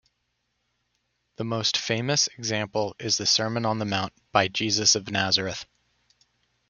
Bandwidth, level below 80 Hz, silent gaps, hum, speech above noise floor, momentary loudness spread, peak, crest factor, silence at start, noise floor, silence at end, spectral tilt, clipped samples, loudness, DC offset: 11 kHz; -64 dBFS; none; 60 Hz at -60 dBFS; 50 dB; 8 LU; -4 dBFS; 24 dB; 1.4 s; -76 dBFS; 1.05 s; -2.5 dB/octave; under 0.1%; -24 LUFS; under 0.1%